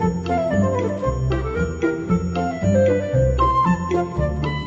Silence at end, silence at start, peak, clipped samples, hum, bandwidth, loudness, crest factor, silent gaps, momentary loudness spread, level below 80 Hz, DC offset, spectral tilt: 0 s; 0 s; -6 dBFS; under 0.1%; none; 7.2 kHz; -20 LUFS; 14 dB; none; 5 LU; -30 dBFS; under 0.1%; -8 dB/octave